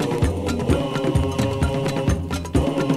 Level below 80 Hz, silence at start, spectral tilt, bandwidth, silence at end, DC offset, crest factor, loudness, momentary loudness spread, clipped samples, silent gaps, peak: -30 dBFS; 0 s; -6.5 dB/octave; 15 kHz; 0 s; under 0.1%; 16 dB; -22 LUFS; 2 LU; under 0.1%; none; -4 dBFS